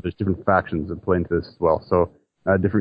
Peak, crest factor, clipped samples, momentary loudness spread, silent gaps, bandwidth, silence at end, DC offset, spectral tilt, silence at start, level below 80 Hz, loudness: -2 dBFS; 18 dB; under 0.1%; 7 LU; none; 5.2 kHz; 0 s; under 0.1%; -11.5 dB/octave; 0.05 s; -40 dBFS; -22 LUFS